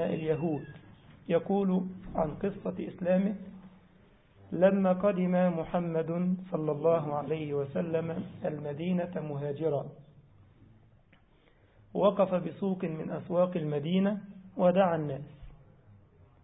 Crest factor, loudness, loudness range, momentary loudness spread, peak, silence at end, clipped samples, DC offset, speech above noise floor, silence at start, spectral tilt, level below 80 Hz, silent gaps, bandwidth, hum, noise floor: 20 dB; -31 LUFS; 6 LU; 11 LU; -12 dBFS; 0.9 s; under 0.1%; under 0.1%; 33 dB; 0 s; -11.5 dB/octave; -60 dBFS; none; 3.9 kHz; none; -63 dBFS